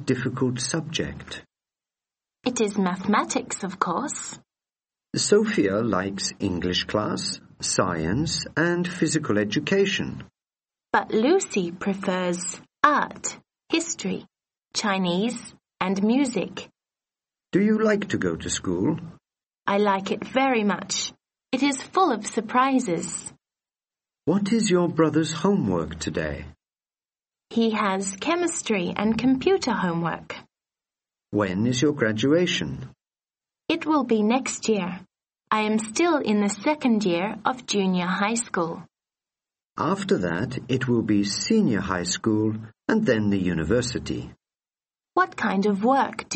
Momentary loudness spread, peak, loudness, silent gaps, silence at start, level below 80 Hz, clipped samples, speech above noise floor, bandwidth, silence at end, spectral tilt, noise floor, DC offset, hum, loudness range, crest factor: 10 LU; 0 dBFS; -24 LUFS; none; 0 s; -54 dBFS; under 0.1%; over 66 dB; 8.8 kHz; 0 s; -4.5 dB/octave; under -90 dBFS; under 0.1%; none; 3 LU; 24 dB